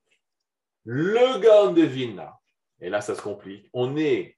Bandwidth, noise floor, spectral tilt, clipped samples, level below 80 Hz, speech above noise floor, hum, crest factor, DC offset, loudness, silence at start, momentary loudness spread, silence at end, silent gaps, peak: 11.5 kHz; -86 dBFS; -6 dB/octave; under 0.1%; -76 dBFS; 64 dB; none; 18 dB; under 0.1%; -22 LUFS; 0.85 s; 19 LU; 0.1 s; none; -6 dBFS